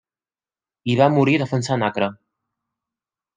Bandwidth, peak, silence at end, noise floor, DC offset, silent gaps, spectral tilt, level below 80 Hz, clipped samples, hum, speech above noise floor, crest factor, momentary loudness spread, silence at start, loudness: 9.6 kHz; -2 dBFS; 1.2 s; under -90 dBFS; under 0.1%; none; -6.5 dB/octave; -66 dBFS; under 0.1%; none; over 72 dB; 20 dB; 10 LU; 0.85 s; -19 LUFS